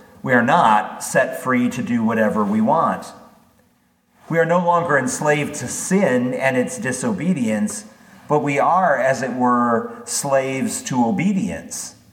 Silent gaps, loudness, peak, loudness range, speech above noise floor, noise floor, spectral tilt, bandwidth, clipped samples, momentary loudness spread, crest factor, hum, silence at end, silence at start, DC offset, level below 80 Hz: none; -19 LUFS; -2 dBFS; 2 LU; 42 dB; -60 dBFS; -5 dB/octave; 17 kHz; under 0.1%; 8 LU; 18 dB; none; 0.2 s; 0.25 s; under 0.1%; -62 dBFS